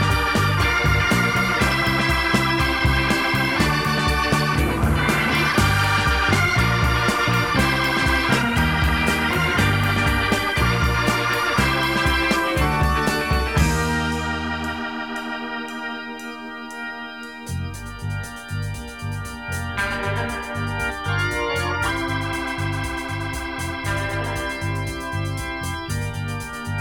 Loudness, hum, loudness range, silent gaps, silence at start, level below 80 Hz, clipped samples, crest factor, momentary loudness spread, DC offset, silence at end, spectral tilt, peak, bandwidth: -21 LUFS; none; 10 LU; none; 0 s; -30 dBFS; under 0.1%; 18 dB; 11 LU; 0.3%; 0 s; -4.5 dB/octave; -4 dBFS; 19 kHz